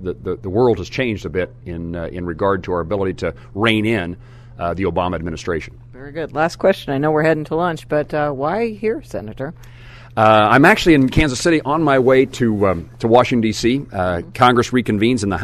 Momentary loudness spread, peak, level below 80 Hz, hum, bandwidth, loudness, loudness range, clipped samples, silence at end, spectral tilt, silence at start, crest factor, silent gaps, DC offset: 14 LU; 0 dBFS; -38 dBFS; none; 13.5 kHz; -17 LUFS; 7 LU; under 0.1%; 0 s; -6 dB/octave; 0 s; 18 dB; none; under 0.1%